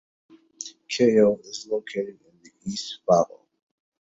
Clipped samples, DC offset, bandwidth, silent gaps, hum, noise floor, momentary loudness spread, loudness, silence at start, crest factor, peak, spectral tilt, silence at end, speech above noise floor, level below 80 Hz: under 0.1%; under 0.1%; 8 kHz; none; none; -43 dBFS; 19 LU; -24 LUFS; 0.6 s; 20 dB; -6 dBFS; -5 dB/octave; 0.9 s; 20 dB; -66 dBFS